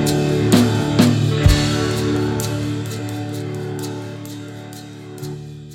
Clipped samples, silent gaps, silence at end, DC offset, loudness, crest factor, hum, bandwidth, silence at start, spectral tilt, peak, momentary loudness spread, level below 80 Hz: under 0.1%; none; 0 s; under 0.1%; -18 LUFS; 18 dB; none; 17 kHz; 0 s; -5.5 dB/octave; 0 dBFS; 18 LU; -32 dBFS